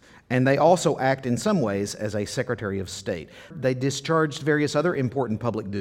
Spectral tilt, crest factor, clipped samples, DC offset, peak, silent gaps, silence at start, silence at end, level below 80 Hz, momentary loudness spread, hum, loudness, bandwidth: -5.5 dB/octave; 18 dB; under 0.1%; under 0.1%; -6 dBFS; none; 0.3 s; 0 s; -58 dBFS; 11 LU; none; -24 LUFS; 16 kHz